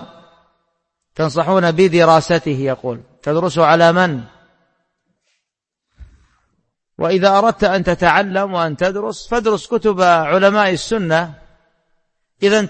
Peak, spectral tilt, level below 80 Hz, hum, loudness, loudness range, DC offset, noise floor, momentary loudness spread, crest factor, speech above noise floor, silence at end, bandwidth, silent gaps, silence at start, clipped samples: 0 dBFS; -5.5 dB/octave; -46 dBFS; none; -15 LUFS; 5 LU; under 0.1%; -80 dBFS; 10 LU; 16 dB; 65 dB; 0 s; 8.8 kHz; none; 0 s; under 0.1%